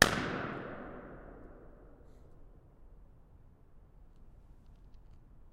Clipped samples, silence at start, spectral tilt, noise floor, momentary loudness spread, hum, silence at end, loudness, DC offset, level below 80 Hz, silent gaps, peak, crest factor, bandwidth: under 0.1%; 0 s; -3 dB/octave; -58 dBFS; 24 LU; none; 0.05 s; -37 LUFS; under 0.1%; -56 dBFS; none; -4 dBFS; 36 dB; 15 kHz